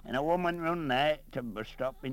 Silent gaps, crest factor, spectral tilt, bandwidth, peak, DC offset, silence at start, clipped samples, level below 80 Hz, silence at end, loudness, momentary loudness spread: none; 16 dB; -6 dB/octave; 16.5 kHz; -16 dBFS; under 0.1%; 0.05 s; under 0.1%; -52 dBFS; 0 s; -32 LUFS; 10 LU